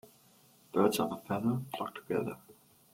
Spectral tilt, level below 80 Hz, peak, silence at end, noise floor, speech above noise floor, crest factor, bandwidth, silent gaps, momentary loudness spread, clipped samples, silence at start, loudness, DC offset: -6 dB/octave; -72 dBFS; -14 dBFS; 0.4 s; -63 dBFS; 31 dB; 22 dB; 16.5 kHz; none; 11 LU; under 0.1%; 0.75 s; -34 LUFS; under 0.1%